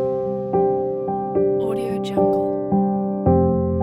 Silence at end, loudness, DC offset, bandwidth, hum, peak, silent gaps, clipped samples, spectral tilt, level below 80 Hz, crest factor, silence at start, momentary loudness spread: 0 s; -20 LUFS; under 0.1%; 11.5 kHz; none; -6 dBFS; none; under 0.1%; -9.5 dB/octave; -42 dBFS; 14 dB; 0 s; 6 LU